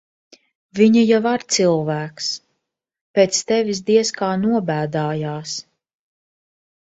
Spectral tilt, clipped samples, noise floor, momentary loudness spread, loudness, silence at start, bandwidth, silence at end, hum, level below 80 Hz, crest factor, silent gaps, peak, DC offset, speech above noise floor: -4.5 dB/octave; under 0.1%; -77 dBFS; 11 LU; -19 LUFS; 0.75 s; 8 kHz; 1.3 s; none; -62 dBFS; 18 dB; 3.01-3.14 s; -2 dBFS; under 0.1%; 59 dB